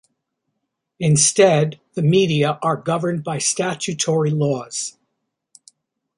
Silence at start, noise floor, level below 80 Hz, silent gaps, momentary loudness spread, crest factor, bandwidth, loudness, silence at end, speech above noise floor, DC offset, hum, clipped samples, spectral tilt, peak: 1 s; -76 dBFS; -60 dBFS; none; 10 LU; 18 dB; 11.5 kHz; -18 LUFS; 1.3 s; 58 dB; under 0.1%; none; under 0.1%; -4.5 dB/octave; -2 dBFS